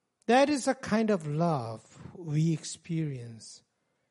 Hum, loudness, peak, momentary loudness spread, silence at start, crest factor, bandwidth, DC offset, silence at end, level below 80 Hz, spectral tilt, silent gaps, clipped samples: none; -29 LUFS; -10 dBFS; 21 LU; 0.3 s; 20 dB; 11.5 kHz; under 0.1%; 0.55 s; -68 dBFS; -6 dB/octave; none; under 0.1%